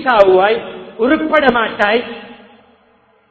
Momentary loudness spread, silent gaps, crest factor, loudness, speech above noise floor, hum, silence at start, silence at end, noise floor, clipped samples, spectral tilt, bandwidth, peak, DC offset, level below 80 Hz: 18 LU; none; 14 dB; -13 LUFS; 41 dB; none; 0 s; 0.95 s; -53 dBFS; 0.2%; -6 dB/octave; 8 kHz; 0 dBFS; under 0.1%; -48 dBFS